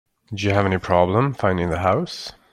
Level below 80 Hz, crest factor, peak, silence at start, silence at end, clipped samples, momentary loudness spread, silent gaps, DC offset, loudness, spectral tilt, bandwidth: -50 dBFS; 18 dB; -2 dBFS; 0.3 s; 0.2 s; under 0.1%; 11 LU; none; under 0.1%; -20 LUFS; -6.5 dB/octave; 12 kHz